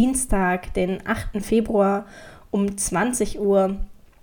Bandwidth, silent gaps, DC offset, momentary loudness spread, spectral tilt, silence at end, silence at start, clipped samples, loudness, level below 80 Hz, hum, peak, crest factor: 18.5 kHz; none; under 0.1%; 8 LU; -5 dB/octave; 0.3 s; 0 s; under 0.1%; -22 LUFS; -34 dBFS; none; -8 dBFS; 14 dB